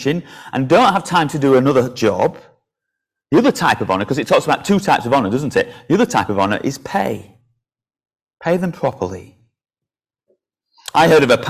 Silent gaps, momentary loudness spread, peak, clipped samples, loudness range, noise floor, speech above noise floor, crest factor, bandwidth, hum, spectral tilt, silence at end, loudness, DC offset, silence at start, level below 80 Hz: none; 11 LU; -2 dBFS; under 0.1%; 9 LU; -86 dBFS; 71 dB; 16 dB; 16 kHz; none; -5.5 dB/octave; 0 s; -16 LUFS; under 0.1%; 0 s; -50 dBFS